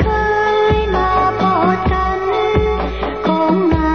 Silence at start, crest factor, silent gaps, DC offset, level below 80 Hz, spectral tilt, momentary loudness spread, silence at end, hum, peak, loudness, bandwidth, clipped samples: 0 s; 14 dB; none; 0.6%; -24 dBFS; -7.5 dB/octave; 4 LU; 0 s; none; -2 dBFS; -15 LUFS; 6.6 kHz; under 0.1%